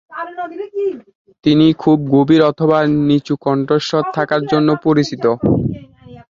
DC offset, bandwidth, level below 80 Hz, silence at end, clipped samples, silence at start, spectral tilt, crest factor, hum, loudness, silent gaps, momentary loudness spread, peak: under 0.1%; 7.4 kHz; -46 dBFS; 0.1 s; under 0.1%; 0.1 s; -7.5 dB/octave; 14 dB; none; -15 LUFS; 1.15-1.25 s; 13 LU; 0 dBFS